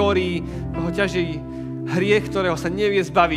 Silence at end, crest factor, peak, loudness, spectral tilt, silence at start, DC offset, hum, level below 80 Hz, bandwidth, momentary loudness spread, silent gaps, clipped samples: 0 s; 20 dB; -2 dBFS; -22 LUFS; -6 dB/octave; 0 s; under 0.1%; none; -40 dBFS; 14 kHz; 10 LU; none; under 0.1%